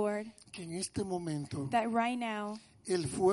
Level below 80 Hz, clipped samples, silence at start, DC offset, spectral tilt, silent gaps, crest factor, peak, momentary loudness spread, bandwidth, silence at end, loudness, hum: -64 dBFS; under 0.1%; 0 s; under 0.1%; -5 dB/octave; none; 18 dB; -16 dBFS; 12 LU; 11.5 kHz; 0 s; -35 LUFS; none